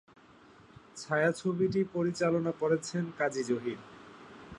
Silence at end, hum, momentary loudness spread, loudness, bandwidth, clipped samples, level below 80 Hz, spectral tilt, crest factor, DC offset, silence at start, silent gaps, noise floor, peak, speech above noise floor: 0 s; none; 21 LU; -31 LUFS; 11.5 kHz; under 0.1%; -68 dBFS; -6 dB/octave; 18 dB; under 0.1%; 0.95 s; none; -57 dBFS; -16 dBFS; 27 dB